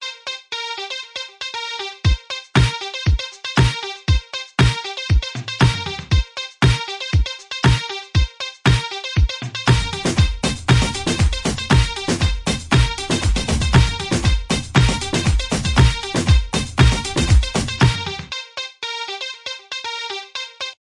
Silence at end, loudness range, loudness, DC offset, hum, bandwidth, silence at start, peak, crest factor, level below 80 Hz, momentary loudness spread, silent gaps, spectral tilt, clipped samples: 0.1 s; 3 LU; -19 LUFS; under 0.1%; none; 11.5 kHz; 0 s; -2 dBFS; 16 dB; -24 dBFS; 10 LU; none; -4.5 dB/octave; under 0.1%